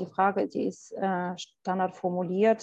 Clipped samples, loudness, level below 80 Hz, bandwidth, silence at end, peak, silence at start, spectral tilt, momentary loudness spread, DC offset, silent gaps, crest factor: under 0.1%; -29 LUFS; -76 dBFS; 8.4 kHz; 0 s; -12 dBFS; 0 s; -6.5 dB/octave; 8 LU; under 0.1%; none; 16 dB